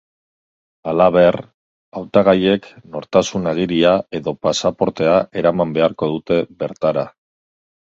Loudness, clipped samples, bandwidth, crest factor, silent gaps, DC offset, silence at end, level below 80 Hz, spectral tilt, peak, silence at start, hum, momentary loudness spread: -17 LUFS; under 0.1%; 7.8 kHz; 18 dB; 1.54-1.92 s; under 0.1%; 0.85 s; -50 dBFS; -5.5 dB/octave; 0 dBFS; 0.85 s; none; 14 LU